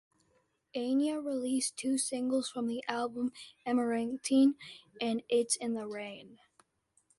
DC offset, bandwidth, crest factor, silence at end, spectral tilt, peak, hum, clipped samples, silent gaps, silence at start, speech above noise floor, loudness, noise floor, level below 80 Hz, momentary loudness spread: under 0.1%; 11.5 kHz; 20 dB; 0.85 s; -3 dB/octave; -14 dBFS; none; under 0.1%; none; 0.75 s; 41 dB; -33 LUFS; -74 dBFS; -78 dBFS; 13 LU